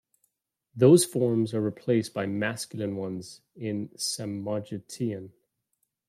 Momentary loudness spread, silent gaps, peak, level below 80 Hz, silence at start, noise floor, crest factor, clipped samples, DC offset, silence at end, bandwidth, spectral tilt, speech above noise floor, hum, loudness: 18 LU; none; -8 dBFS; -72 dBFS; 0.75 s; -78 dBFS; 20 dB; under 0.1%; under 0.1%; 0.8 s; 15.5 kHz; -5.5 dB/octave; 51 dB; none; -27 LUFS